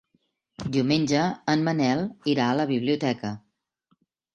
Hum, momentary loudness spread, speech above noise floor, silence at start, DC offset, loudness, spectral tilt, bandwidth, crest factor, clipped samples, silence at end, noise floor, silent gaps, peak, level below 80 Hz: none; 9 LU; 47 dB; 0.6 s; under 0.1%; -25 LUFS; -6 dB/octave; 8.8 kHz; 18 dB; under 0.1%; 0.95 s; -71 dBFS; none; -8 dBFS; -60 dBFS